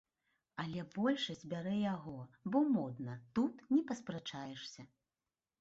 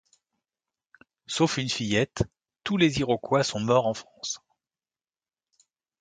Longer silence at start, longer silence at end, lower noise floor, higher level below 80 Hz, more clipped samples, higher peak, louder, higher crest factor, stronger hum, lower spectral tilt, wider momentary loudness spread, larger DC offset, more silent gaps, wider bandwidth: second, 0.55 s vs 1.3 s; second, 0.75 s vs 1.65 s; about the same, under -90 dBFS vs under -90 dBFS; second, -76 dBFS vs -54 dBFS; neither; second, -22 dBFS vs -8 dBFS; second, -39 LUFS vs -26 LUFS; about the same, 18 dB vs 22 dB; neither; about the same, -5 dB/octave vs -4.5 dB/octave; about the same, 13 LU vs 11 LU; neither; neither; second, 8 kHz vs 9.6 kHz